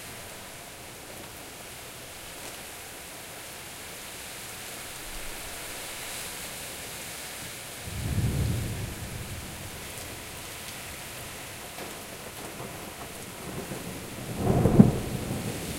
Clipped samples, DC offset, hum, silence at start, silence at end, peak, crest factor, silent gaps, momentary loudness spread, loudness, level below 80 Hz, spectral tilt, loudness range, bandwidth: under 0.1%; under 0.1%; none; 0 s; 0 s; 0 dBFS; 32 dB; none; 12 LU; -33 LUFS; -46 dBFS; -5 dB/octave; 12 LU; 16 kHz